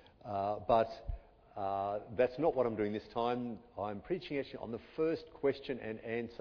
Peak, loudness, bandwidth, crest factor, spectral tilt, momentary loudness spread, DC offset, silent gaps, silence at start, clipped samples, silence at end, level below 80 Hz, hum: -16 dBFS; -37 LUFS; 5.4 kHz; 22 dB; -5 dB/octave; 12 LU; under 0.1%; none; 0.25 s; under 0.1%; 0.05 s; -56 dBFS; none